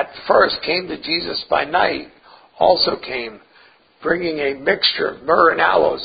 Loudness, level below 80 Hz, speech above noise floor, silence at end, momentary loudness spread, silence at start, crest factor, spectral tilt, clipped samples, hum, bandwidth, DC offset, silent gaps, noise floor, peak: -17 LUFS; -52 dBFS; 33 dB; 0 s; 11 LU; 0 s; 18 dB; -8.5 dB/octave; under 0.1%; none; 5 kHz; under 0.1%; none; -51 dBFS; 0 dBFS